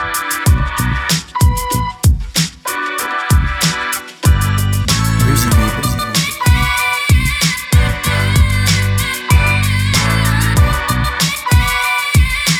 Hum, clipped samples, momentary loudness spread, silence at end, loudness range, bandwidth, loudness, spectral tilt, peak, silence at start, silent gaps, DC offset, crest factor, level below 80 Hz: none; under 0.1%; 5 LU; 0 s; 2 LU; 19.5 kHz; -14 LUFS; -4 dB/octave; 0 dBFS; 0 s; none; under 0.1%; 14 dB; -20 dBFS